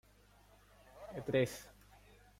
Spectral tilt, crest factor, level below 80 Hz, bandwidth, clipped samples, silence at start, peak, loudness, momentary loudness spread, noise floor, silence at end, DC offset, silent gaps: -5.5 dB/octave; 22 dB; -66 dBFS; 16.5 kHz; under 0.1%; 0.95 s; -20 dBFS; -38 LUFS; 24 LU; -65 dBFS; 0.7 s; under 0.1%; none